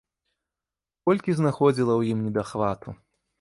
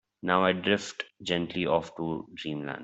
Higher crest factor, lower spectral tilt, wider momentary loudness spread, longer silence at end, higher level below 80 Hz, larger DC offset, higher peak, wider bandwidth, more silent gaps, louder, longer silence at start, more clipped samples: about the same, 18 dB vs 22 dB; first, -8 dB/octave vs -5 dB/octave; second, 8 LU vs 11 LU; first, 0.45 s vs 0 s; first, -58 dBFS vs -66 dBFS; neither; about the same, -8 dBFS vs -6 dBFS; first, 11.5 kHz vs 8.2 kHz; neither; first, -24 LUFS vs -29 LUFS; first, 1.05 s vs 0.25 s; neither